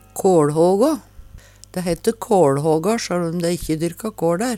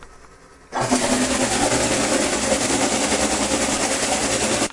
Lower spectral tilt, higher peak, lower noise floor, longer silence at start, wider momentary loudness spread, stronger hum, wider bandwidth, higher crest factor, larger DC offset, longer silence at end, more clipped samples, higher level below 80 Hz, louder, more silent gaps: first, -6 dB/octave vs -2.5 dB/octave; about the same, -2 dBFS vs -4 dBFS; about the same, -43 dBFS vs -46 dBFS; first, 0.15 s vs 0 s; first, 9 LU vs 1 LU; neither; first, 16.5 kHz vs 11.5 kHz; about the same, 16 dB vs 16 dB; neither; about the same, 0 s vs 0 s; neither; about the same, -46 dBFS vs -42 dBFS; about the same, -19 LUFS vs -19 LUFS; neither